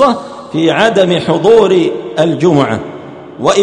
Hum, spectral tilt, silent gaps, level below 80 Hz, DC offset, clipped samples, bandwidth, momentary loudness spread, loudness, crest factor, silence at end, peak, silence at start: none; -5.5 dB/octave; none; -48 dBFS; under 0.1%; 0.4%; 10.5 kHz; 13 LU; -11 LUFS; 10 dB; 0 s; 0 dBFS; 0 s